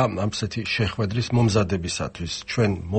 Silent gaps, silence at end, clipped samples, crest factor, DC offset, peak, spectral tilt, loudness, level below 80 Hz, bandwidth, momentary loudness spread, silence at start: none; 0 s; under 0.1%; 16 dB; under 0.1%; -8 dBFS; -5.5 dB/octave; -24 LUFS; -44 dBFS; 8.8 kHz; 8 LU; 0 s